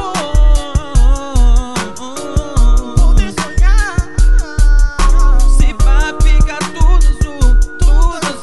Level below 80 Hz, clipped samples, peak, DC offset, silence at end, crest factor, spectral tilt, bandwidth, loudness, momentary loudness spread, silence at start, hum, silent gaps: -10 dBFS; under 0.1%; 0 dBFS; 4%; 0 s; 10 dB; -5 dB/octave; 12 kHz; -14 LUFS; 4 LU; 0 s; none; none